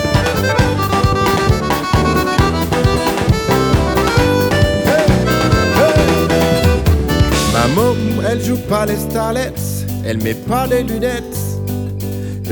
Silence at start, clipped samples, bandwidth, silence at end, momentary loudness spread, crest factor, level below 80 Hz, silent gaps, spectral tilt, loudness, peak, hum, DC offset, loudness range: 0 s; under 0.1%; over 20 kHz; 0 s; 8 LU; 12 dB; -24 dBFS; none; -5.5 dB/octave; -15 LUFS; -2 dBFS; none; under 0.1%; 5 LU